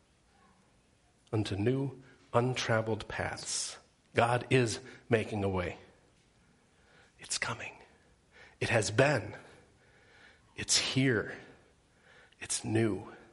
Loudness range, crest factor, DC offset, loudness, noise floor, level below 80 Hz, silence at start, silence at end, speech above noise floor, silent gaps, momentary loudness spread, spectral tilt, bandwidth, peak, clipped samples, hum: 5 LU; 26 dB; under 0.1%; -32 LUFS; -67 dBFS; -62 dBFS; 1.3 s; 0.1 s; 36 dB; none; 16 LU; -4 dB/octave; 11.5 kHz; -8 dBFS; under 0.1%; none